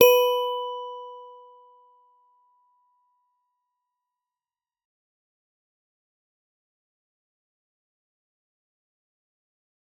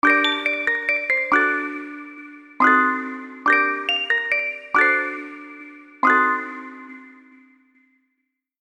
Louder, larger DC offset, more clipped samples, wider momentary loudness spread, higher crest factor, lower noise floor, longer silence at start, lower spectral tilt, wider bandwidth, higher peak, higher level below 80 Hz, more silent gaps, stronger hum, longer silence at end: second, -24 LUFS vs -19 LUFS; neither; neither; first, 25 LU vs 21 LU; first, 30 dB vs 20 dB; first, under -90 dBFS vs -76 dBFS; about the same, 0 s vs 0.05 s; second, -0.5 dB/octave vs -2.5 dB/octave; first, 16 kHz vs 11.5 kHz; about the same, -2 dBFS vs -4 dBFS; second, -86 dBFS vs -72 dBFS; neither; neither; first, 8.7 s vs 1.5 s